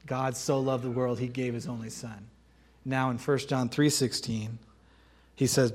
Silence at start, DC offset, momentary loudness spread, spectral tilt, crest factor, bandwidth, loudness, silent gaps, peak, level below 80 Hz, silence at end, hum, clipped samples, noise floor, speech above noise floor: 0.05 s; under 0.1%; 15 LU; -5 dB/octave; 20 dB; 16.5 kHz; -30 LUFS; none; -10 dBFS; -62 dBFS; 0 s; none; under 0.1%; -60 dBFS; 31 dB